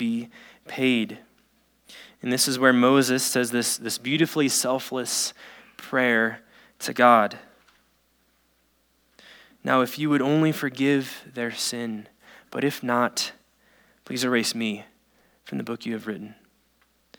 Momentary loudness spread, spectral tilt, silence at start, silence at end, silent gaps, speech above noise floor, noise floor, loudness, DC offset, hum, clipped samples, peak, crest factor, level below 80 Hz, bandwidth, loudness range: 17 LU; -3.5 dB/octave; 0 s; 0.85 s; none; 43 dB; -66 dBFS; -24 LUFS; under 0.1%; none; under 0.1%; -2 dBFS; 24 dB; -74 dBFS; over 20 kHz; 7 LU